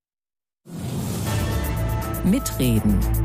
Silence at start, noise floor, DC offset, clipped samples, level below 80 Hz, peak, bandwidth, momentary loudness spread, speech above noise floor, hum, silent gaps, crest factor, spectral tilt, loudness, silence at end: 0.65 s; under -90 dBFS; under 0.1%; under 0.1%; -30 dBFS; -8 dBFS; 15.5 kHz; 9 LU; over 71 dB; none; none; 14 dB; -6 dB/octave; -23 LUFS; 0 s